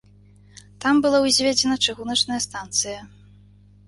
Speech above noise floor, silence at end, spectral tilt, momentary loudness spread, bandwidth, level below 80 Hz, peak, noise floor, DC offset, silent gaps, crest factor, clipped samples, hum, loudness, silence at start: 30 dB; 0.8 s; -2 dB/octave; 9 LU; 11.5 kHz; -54 dBFS; -6 dBFS; -51 dBFS; under 0.1%; none; 18 dB; under 0.1%; 50 Hz at -45 dBFS; -20 LUFS; 0.8 s